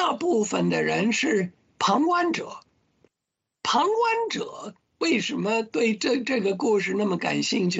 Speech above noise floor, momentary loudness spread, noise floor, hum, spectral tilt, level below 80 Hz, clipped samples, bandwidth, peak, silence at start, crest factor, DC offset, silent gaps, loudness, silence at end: 60 dB; 9 LU; -84 dBFS; none; -4.5 dB/octave; -70 dBFS; under 0.1%; 8.4 kHz; -10 dBFS; 0 s; 16 dB; under 0.1%; none; -24 LUFS; 0 s